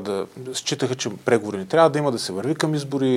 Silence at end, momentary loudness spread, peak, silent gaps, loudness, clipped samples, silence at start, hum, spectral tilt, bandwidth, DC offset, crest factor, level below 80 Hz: 0 s; 10 LU; -4 dBFS; none; -22 LUFS; under 0.1%; 0 s; none; -5 dB/octave; 16 kHz; under 0.1%; 18 dB; -70 dBFS